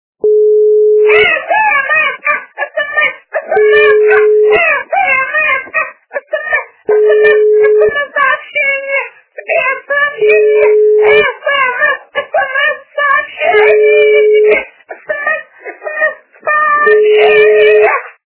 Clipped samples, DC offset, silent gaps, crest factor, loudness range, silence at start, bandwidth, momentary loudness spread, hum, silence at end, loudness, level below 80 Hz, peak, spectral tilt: 0.4%; under 0.1%; none; 10 dB; 1 LU; 0.25 s; 4 kHz; 10 LU; none; 0.25 s; -9 LUFS; -54 dBFS; 0 dBFS; -6 dB/octave